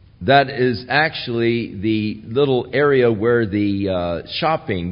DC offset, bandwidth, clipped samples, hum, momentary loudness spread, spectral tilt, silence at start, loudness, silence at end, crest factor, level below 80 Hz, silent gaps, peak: under 0.1%; 5.4 kHz; under 0.1%; none; 7 LU; -11.5 dB/octave; 0.2 s; -18 LUFS; 0 s; 18 dB; -48 dBFS; none; -2 dBFS